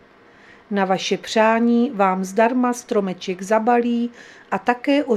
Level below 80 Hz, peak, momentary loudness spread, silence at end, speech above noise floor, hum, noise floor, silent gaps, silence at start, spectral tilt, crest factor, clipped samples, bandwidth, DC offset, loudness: -66 dBFS; -2 dBFS; 9 LU; 0 s; 30 dB; none; -49 dBFS; none; 0.7 s; -5 dB/octave; 18 dB; under 0.1%; 13 kHz; under 0.1%; -20 LUFS